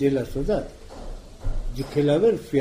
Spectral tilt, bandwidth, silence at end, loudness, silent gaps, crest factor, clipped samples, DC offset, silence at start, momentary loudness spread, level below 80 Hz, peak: -7.5 dB/octave; 15.5 kHz; 0 s; -24 LUFS; none; 14 dB; under 0.1%; under 0.1%; 0 s; 21 LU; -32 dBFS; -10 dBFS